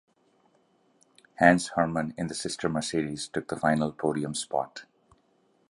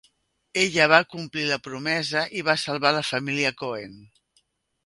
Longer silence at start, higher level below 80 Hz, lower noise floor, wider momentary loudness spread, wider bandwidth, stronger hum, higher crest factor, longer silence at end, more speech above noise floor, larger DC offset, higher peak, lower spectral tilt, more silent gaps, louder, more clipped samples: first, 1.4 s vs 0.55 s; first, -60 dBFS vs -66 dBFS; about the same, -67 dBFS vs -68 dBFS; about the same, 12 LU vs 14 LU; about the same, 11.5 kHz vs 11.5 kHz; neither; about the same, 26 dB vs 24 dB; about the same, 0.9 s vs 0.8 s; second, 40 dB vs 44 dB; neither; second, -4 dBFS vs 0 dBFS; about the same, -4.5 dB/octave vs -3.5 dB/octave; neither; second, -28 LUFS vs -23 LUFS; neither